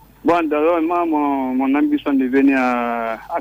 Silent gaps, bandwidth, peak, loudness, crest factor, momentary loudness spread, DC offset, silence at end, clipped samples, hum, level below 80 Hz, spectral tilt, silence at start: none; 16 kHz; -4 dBFS; -18 LUFS; 14 dB; 5 LU; under 0.1%; 0 s; under 0.1%; none; -52 dBFS; -6.5 dB/octave; 0.25 s